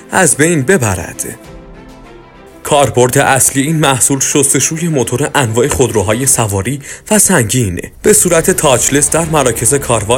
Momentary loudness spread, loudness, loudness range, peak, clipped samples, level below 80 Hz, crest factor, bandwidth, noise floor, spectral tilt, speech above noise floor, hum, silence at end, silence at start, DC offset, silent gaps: 9 LU; -10 LUFS; 3 LU; 0 dBFS; 0.4%; -36 dBFS; 12 dB; over 20 kHz; -36 dBFS; -3.5 dB/octave; 25 dB; none; 0 s; 0 s; under 0.1%; none